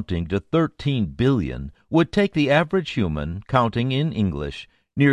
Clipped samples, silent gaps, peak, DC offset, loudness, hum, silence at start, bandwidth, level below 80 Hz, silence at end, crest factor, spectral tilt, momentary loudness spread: under 0.1%; none; -4 dBFS; under 0.1%; -22 LUFS; none; 0 s; 10.5 kHz; -40 dBFS; 0 s; 18 dB; -7.5 dB/octave; 11 LU